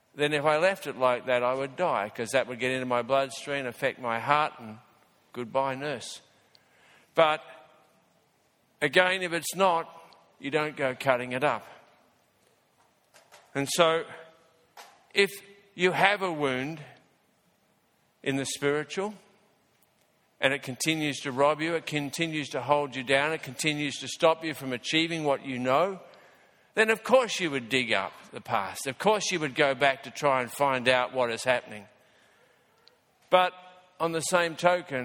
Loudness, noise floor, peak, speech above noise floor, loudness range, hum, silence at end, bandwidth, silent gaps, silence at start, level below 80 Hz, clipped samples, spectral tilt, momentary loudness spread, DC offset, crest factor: -27 LUFS; -69 dBFS; -4 dBFS; 41 dB; 5 LU; none; 0 s; 18 kHz; none; 0.15 s; -72 dBFS; under 0.1%; -3.5 dB/octave; 10 LU; under 0.1%; 26 dB